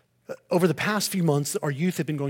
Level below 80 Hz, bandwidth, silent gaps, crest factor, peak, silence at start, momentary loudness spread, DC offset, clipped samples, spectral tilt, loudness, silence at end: -70 dBFS; 17 kHz; none; 16 dB; -8 dBFS; 0.3 s; 7 LU; under 0.1%; under 0.1%; -5 dB/octave; -25 LUFS; 0 s